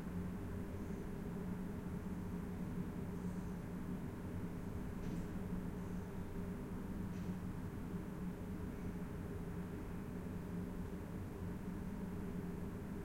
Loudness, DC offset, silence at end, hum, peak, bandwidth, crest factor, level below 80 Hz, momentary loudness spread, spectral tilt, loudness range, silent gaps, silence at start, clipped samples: -46 LUFS; under 0.1%; 0 s; none; -32 dBFS; 16.5 kHz; 12 dB; -54 dBFS; 2 LU; -8 dB/octave; 1 LU; none; 0 s; under 0.1%